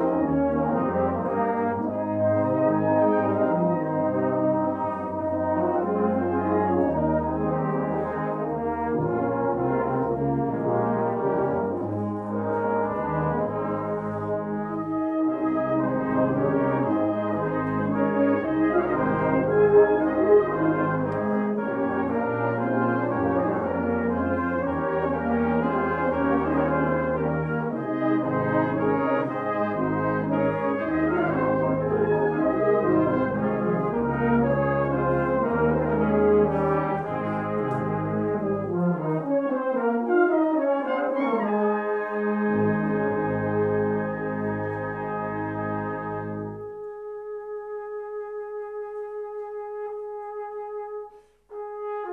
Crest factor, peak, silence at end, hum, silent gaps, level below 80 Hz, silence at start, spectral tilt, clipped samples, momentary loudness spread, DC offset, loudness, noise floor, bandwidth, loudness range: 16 dB; -8 dBFS; 0 s; none; none; -50 dBFS; 0 s; -10.5 dB/octave; under 0.1%; 11 LU; under 0.1%; -25 LUFS; -47 dBFS; 4.5 kHz; 8 LU